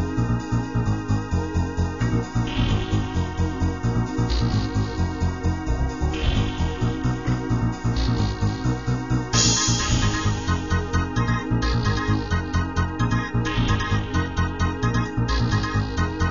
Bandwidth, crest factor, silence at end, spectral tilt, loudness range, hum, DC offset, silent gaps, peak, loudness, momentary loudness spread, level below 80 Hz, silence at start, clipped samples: 7.4 kHz; 18 dB; 0 s; -5 dB/octave; 3 LU; none; 0.7%; none; -6 dBFS; -24 LUFS; 4 LU; -30 dBFS; 0 s; under 0.1%